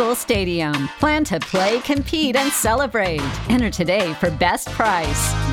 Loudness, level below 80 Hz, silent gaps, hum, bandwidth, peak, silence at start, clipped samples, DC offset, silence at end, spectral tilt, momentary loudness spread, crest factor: -19 LUFS; -34 dBFS; none; none; 19 kHz; -2 dBFS; 0 s; under 0.1%; under 0.1%; 0 s; -4 dB/octave; 3 LU; 16 dB